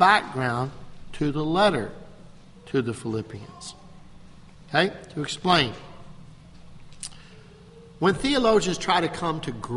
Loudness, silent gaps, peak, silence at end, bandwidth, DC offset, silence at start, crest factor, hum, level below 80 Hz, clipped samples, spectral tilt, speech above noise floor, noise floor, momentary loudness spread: -24 LUFS; none; -4 dBFS; 0 s; 11.5 kHz; under 0.1%; 0 s; 24 dB; none; -48 dBFS; under 0.1%; -4.5 dB/octave; 24 dB; -48 dBFS; 18 LU